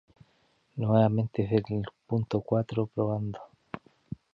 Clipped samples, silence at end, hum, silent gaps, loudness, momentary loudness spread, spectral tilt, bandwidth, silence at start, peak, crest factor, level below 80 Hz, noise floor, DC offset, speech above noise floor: under 0.1%; 0.55 s; none; none; -29 LUFS; 20 LU; -10 dB/octave; 5.8 kHz; 0.75 s; -12 dBFS; 18 dB; -58 dBFS; -68 dBFS; under 0.1%; 41 dB